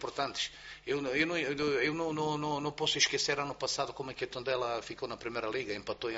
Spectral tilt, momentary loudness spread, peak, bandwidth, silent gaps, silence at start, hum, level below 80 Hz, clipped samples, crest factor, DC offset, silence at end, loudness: -2 dB/octave; 10 LU; -12 dBFS; 8 kHz; none; 0 s; none; -64 dBFS; under 0.1%; 22 dB; under 0.1%; 0 s; -33 LUFS